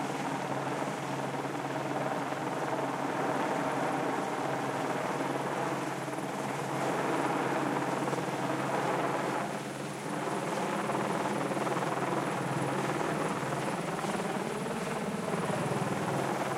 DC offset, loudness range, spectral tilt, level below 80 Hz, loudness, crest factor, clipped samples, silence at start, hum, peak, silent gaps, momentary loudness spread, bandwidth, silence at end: under 0.1%; 1 LU; -5 dB/octave; -70 dBFS; -33 LUFS; 16 dB; under 0.1%; 0 s; none; -16 dBFS; none; 4 LU; 16.5 kHz; 0 s